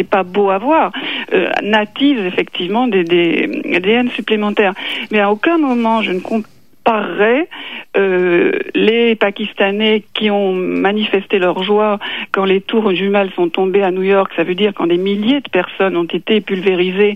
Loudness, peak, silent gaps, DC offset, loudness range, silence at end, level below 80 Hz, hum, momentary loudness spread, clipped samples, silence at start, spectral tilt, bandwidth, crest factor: -14 LUFS; 0 dBFS; none; 0.6%; 1 LU; 0 s; -62 dBFS; none; 5 LU; under 0.1%; 0 s; -7 dB/octave; 7.2 kHz; 14 dB